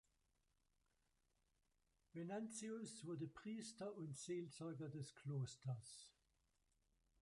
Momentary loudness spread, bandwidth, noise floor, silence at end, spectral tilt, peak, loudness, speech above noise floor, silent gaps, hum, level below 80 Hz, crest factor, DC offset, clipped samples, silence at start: 6 LU; 11.5 kHz; -85 dBFS; 1.1 s; -5.5 dB/octave; -38 dBFS; -52 LUFS; 34 dB; none; none; -84 dBFS; 16 dB; under 0.1%; under 0.1%; 2.15 s